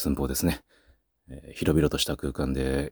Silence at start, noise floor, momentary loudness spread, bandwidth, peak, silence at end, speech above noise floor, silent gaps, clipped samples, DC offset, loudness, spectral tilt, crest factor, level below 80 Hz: 0 s; -63 dBFS; 18 LU; over 20 kHz; -8 dBFS; 0 s; 36 dB; none; under 0.1%; under 0.1%; -27 LUFS; -5 dB/octave; 18 dB; -38 dBFS